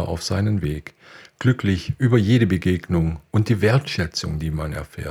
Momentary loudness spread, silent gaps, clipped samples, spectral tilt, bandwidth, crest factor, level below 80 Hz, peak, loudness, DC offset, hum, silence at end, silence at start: 10 LU; none; under 0.1%; -6.5 dB/octave; 15 kHz; 18 dB; -38 dBFS; -4 dBFS; -21 LUFS; under 0.1%; none; 0 s; 0 s